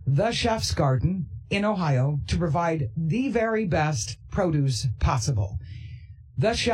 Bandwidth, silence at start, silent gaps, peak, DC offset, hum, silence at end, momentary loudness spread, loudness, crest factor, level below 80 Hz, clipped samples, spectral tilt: 12.5 kHz; 0 s; none; -10 dBFS; under 0.1%; none; 0 s; 9 LU; -25 LUFS; 14 dB; -40 dBFS; under 0.1%; -5.5 dB/octave